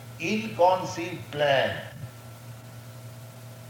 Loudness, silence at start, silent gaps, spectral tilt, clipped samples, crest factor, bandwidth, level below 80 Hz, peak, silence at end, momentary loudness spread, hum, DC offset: -26 LUFS; 0 s; none; -5 dB/octave; under 0.1%; 20 dB; 19.5 kHz; -64 dBFS; -8 dBFS; 0 s; 21 LU; none; under 0.1%